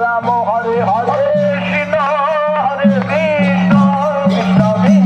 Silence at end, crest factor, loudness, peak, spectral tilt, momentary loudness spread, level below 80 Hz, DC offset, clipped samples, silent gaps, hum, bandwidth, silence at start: 0 s; 12 dB; -13 LUFS; 0 dBFS; -8 dB/octave; 4 LU; -48 dBFS; under 0.1%; under 0.1%; none; none; 8 kHz; 0 s